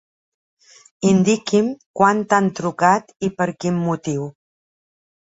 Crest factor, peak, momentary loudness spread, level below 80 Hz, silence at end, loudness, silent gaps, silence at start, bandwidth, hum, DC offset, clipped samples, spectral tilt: 18 dB; -2 dBFS; 9 LU; -60 dBFS; 1 s; -19 LUFS; 1.86-1.94 s; 1 s; 8 kHz; none; under 0.1%; under 0.1%; -6 dB/octave